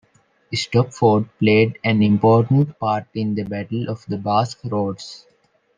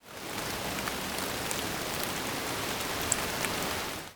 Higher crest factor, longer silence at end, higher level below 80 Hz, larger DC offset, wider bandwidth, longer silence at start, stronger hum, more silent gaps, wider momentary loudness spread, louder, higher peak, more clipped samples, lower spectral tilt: second, 18 dB vs 30 dB; first, 0.6 s vs 0 s; about the same, -58 dBFS vs -54 dBFS; neither; second, 9.6 kHz vs over 20 kHz; first, 0.5 s vs 0.05 s; neither; neither; first, 11 LU vs 4 LU; first, -19 LUFS vs -32 LUFS; about the same, -2 dBFS vs -4 dBFS; neither; first, -7 dB/octave vs -2 dB/octave